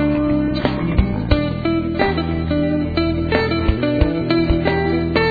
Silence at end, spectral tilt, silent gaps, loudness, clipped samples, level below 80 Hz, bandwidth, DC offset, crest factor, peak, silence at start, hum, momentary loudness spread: 0 s; -9.5 dB/octave; none; -18 LUFS; under 0.1%; -26 dBFS; 4.9 kHz; under 0.1%; 18 dB; 0 dBFS; 0 s; none; 2 LU